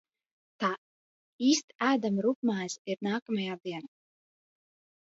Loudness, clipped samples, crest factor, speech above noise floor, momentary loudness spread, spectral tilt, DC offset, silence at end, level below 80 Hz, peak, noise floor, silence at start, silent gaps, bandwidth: -31 LUFS; under 0.1%; 20 dB; over 60 dB; 11 LU; -4 dB/octave; under 0.1%; 1.2 s; -82 dBFS; -12 dBFS; under -90 dBFS; 0.6 s; 0.78-1.39 s, 1.64-1.68 s, 2.35-2.42 s, 2.79-2.85 s, 3.22-3.26 s; 8 kHz